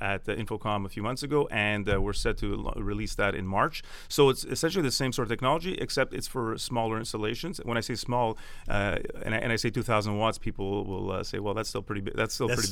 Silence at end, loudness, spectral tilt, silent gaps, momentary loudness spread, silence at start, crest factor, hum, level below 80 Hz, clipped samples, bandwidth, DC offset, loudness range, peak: 0 s; -29 LUFS; -4.5 dB/octave; none; 7 LU; 0 s; 20 dB; none; -40 dBFS; under 0.1%; 17.5 kHz; under 0.1%; 3 LU; -8 dBFS